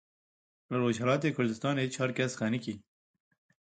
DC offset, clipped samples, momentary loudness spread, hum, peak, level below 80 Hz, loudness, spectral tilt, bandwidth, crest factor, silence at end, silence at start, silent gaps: under 0.1%; under 0.1%; 8 LU; none; -14 dBFS; -70 dBFS; -31 LUFS; -5.5 dB/octave; 9.4 kHz; 18 dB; 0.85 s; 0.7 s; none